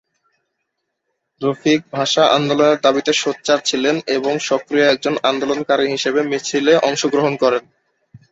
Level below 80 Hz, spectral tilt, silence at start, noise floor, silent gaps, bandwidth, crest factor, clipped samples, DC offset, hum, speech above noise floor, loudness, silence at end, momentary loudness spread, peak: -62 dBFS; -3.5 dB/octave; 1.4 s; -75 dBFS; none; 8 kHz; 16 dB; under 0.1%; under 0.1%; none; 58 dB; -17 LUFS; 0.15 s; 6 LU; -2 dBFS